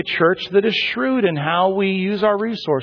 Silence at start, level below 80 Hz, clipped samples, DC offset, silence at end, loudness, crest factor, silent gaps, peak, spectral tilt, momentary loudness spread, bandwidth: 0 s; -58 dBFS; under 0.1%; under 0.1%; 0 s; -18 LUFS; 14 dB; none; -4 dBFS; -7 dB/octave; 3 LU; 5.4 kHz